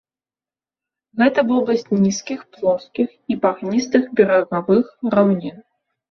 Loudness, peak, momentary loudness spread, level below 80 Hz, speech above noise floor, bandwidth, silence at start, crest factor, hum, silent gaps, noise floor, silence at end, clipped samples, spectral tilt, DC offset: -18 LUFS; -2 dBFS; 8 LU; -60 dBFS; over 72 dB; 7.2 kHz; 1.15 s; 18 dB; none; none; under -90 dBFS; 0.5 s; under 0.1%; -6 dB/octave; under 0.1%